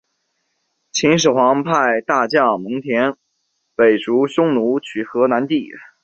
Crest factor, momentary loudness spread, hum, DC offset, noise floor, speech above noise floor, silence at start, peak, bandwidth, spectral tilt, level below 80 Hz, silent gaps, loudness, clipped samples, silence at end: 16 dB; 8 LU; none; under 0.1%; -70 dBFS; 54 dB; 0.95 s; -2 dBFS; 8.2 kHz; -4.5 dB/octave; -60 dBFS; none; -17 LUFS; under 0.1%; 0.2 s